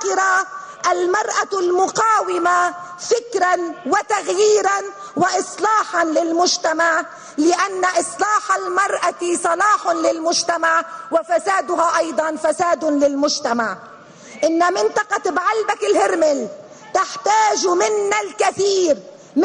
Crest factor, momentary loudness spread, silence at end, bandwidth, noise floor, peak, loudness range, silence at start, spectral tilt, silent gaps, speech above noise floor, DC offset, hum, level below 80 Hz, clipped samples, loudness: 12 dB; 6 LU; 0 s; 10.5 kHz; -40 dBFS; -6 dBFS; 1 LU; 0 s; -2 dB/octave; none; 22 dB; under 0.1%; none; -64 dBFS; under 0.1%; -18 LUFS